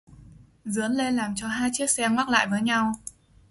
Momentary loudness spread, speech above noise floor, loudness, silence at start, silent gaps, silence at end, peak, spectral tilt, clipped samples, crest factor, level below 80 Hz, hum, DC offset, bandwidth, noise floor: 11 LU; 26 dB; -25 LUFS; 0.1 s; none; 0.4 s; -6 dBFS; -3 dB/octave; under 0.1%; 20 dB; -56 dBFS; none; under 0.1%; 12 kHz; -50 dBFS